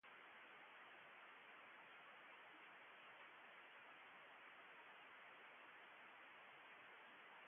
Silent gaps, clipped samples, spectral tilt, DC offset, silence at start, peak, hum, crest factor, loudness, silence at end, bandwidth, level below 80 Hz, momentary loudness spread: none; under 0.1%; 3.5 dB/octave; under 0.1%; 0.05 s; -50 dBFS; none; 14 dB; -62 LUFS; 0 s; 3.6 kHz; under -90 dBFS; 0 LU